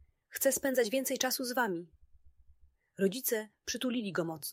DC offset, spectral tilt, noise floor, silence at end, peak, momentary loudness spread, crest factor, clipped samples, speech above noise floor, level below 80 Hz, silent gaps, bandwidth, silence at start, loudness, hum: under 0.1%; -3 dB/octave; -64 dBFS; 0 s; -14 dBFS; 6 LU; 20 dB; under 0.1%; 31 dB; -70 dBFS; none; 16 kHz; 0.3 s; -33 LUFS; none